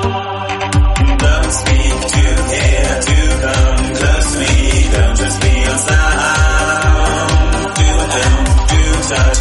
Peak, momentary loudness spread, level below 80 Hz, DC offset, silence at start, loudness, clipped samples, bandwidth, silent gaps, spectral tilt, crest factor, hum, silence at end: 0 dBFS; 2 LU; -14 dBFS; under 0.1%; 0 s; -13 LUFS; under 0.1%; 11.5 kHz; none; -4 dB/octave; 12 dB; none; 0 s